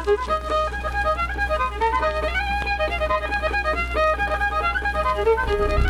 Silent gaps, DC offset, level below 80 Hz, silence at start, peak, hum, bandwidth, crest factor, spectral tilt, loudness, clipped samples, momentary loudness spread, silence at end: none; under 0.1%; -30 dBFS; 0 s; -8 dBFS; none; 13 kHz; 14 dB; -5.5 dB/octave; -22 LUFS; under 0.1%; 3 LU; 0 s